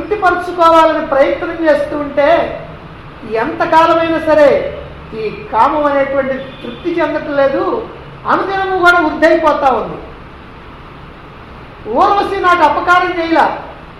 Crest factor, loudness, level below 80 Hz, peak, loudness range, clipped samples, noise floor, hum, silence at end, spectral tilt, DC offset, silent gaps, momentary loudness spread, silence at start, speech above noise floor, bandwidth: 14 dB; -12 LUFS; -38 dBFS; 0 dBFS; 3 LU; under 0.1%; -33 dBFS; none; 0 s; -5.5 dB/octave; under 0.1%; none; 18 LU; 0 s; 21 dB; 13 kHz